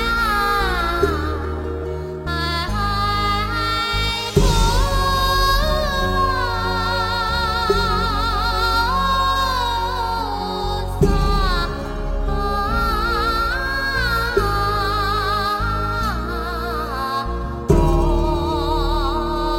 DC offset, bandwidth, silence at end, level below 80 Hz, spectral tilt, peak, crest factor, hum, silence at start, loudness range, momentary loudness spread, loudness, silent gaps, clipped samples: under 0.1%; 16.5 kHz; 0 s; -24 dBFS; -5 dB/octave; -2 dBFS; 16 dB; none; 0 s; 3 LU; 7 LU; -20 LUFS; none; under 0.1%